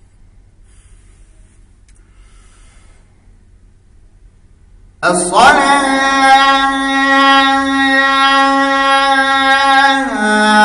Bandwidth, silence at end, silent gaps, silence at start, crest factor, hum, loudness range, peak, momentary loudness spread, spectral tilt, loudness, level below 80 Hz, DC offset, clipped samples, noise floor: 11 kHz; 0 s; none; 5 s; 12 dB; none; 6 LU; 0 dBFS; 5 LU; -2.5 dB/octave; -10 LUFS; -42 dBFS; under 0.1%; under 0.1%; -44 dBFS